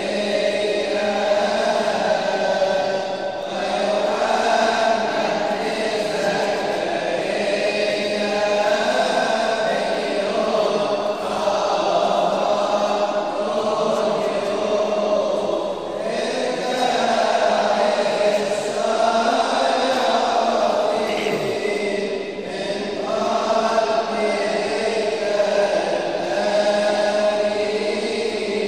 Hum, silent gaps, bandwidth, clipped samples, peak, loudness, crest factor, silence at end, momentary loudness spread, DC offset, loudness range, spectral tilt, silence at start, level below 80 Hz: none; none; 13 kHz; under 0.1%; -6 dBFS; -20 LUFS; 16 dB; 0 s; 4 LU; 0.3%; 2 LU; -3.5 dB/octave; 0 s; -58 dBFS